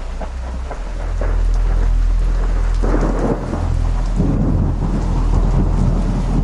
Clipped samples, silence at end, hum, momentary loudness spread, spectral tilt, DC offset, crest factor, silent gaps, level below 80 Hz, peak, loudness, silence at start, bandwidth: under 0.1%; 0 s; none; 10 LU; -8 dB/octave; under 0.1%; 12 dB; none; -16 dBFS; -4 dBFS; -20 LUFS; 0 s; 8 kHz